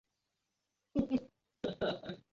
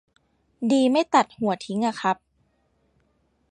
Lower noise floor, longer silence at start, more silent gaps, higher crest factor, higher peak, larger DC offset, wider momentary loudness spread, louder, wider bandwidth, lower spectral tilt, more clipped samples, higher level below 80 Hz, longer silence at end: first, -86 dBFS vs -68 dBFS; first, 0.95 s vs 0.6 s; neither; about the same, 20 dB vs 22 dB; second, -20 dBFS vs -4 dBFS; neither; about the same, 8 LU vs 8 LU; second, -39 LUFS vs -23 LUFS; second, 7.2 kHz vs 10.5 kHz; about the same, -5 dB/octave vs -5 dB/octave; neither; first, -62 dBFS vs -70 dBFS; second, 0.15 s vs 1.35 s